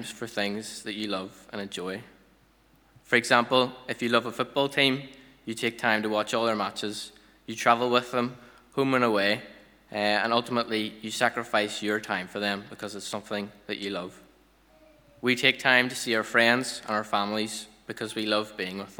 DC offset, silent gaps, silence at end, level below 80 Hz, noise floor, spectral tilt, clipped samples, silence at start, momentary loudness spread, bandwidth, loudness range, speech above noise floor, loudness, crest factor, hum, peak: under 0.1%; none; 0.05 s; -68 dBFS; -61 dBFS; -3.5 dB/octave; under 0.1%; 0 s; 15 LU; over 20 kHz; 5 LU; 34 dB; -27 LUFS; 26 dB; none; -4 dBFS